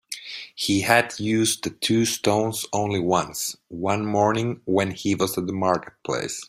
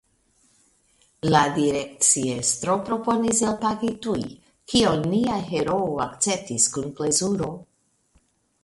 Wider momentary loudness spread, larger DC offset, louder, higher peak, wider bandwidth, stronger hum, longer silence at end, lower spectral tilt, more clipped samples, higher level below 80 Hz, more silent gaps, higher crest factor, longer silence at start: about the same, 9 LU vs 9 LU; neither; about the same, -23 LUFS vs -22 LUFS; about the same, -2 dBFS vs -4 dBFS; first, 16 kHz vs 12 kHz; neither; second, 0.05 s vs 1 s; about the same, -4 dB/octave vs -3.5 dB/octave; neither; about the same, -58 dBFS vs -54 dBFS; neither; about the same, 22 dB vs 20 dB; second, 0.1 s vs 1.25 s